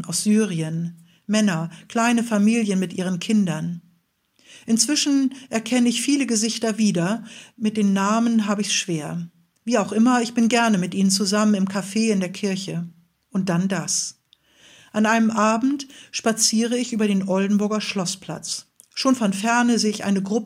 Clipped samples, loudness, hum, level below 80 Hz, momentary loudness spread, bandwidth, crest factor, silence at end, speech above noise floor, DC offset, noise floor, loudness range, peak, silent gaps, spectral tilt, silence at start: under 0.1%; -21 LUFS; none; -70 dBFS; 11 LU; 16 kHz; 18 dB; 0 s; 44 dB; under 0.1%; -65 dBFS; 2 LU; -2 dBFS; none; -4 dB/octave; 0 s